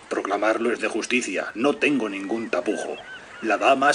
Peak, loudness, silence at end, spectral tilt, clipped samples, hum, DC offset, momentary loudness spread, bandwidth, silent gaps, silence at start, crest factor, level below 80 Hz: -4 dBFS; -24 LUFS; 0 s; -3.5 dB/octave; under 0.1%; none; under 0.1%; 10 LU; 10.5 kHz; none; 0 s; 20 dB; -68 dBFS